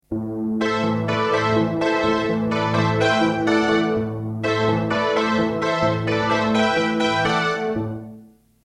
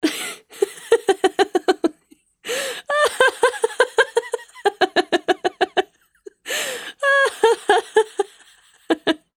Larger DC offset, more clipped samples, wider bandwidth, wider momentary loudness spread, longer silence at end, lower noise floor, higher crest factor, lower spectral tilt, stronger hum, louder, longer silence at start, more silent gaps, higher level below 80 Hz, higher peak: neither; neither; second, 11 kHz vs 18 kHz; second, 7 LU vs 10 LU; first, 0.4 s vs 0.2 s; second, -47 dBFS vs -56 dBFS; about the same, 14 dB vs 18 dB; first, -6 dB/octave vs -1.5 dB/octave; neither; about the same, -20 LUFS vs -20 LUFS; about the same, 0.1 s vs 0.05 s; neither; first, -50 dBFS vs -68 dBFS; second, -6 dBFS vs -2 dBFS